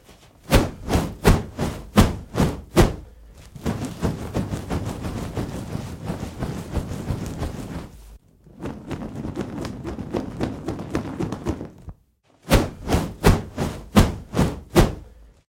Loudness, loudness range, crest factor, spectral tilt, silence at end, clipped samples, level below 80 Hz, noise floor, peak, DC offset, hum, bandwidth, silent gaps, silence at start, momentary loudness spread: -24 LUFS; 10 LU; 22 dB; -6 dB/octave; 0.25 s; under 0.1%; -30 dBFS; -60 dBFS; -2 dBFS; under 0.1%; none; 16.5 kHz; none; 0.1 s; 13 LU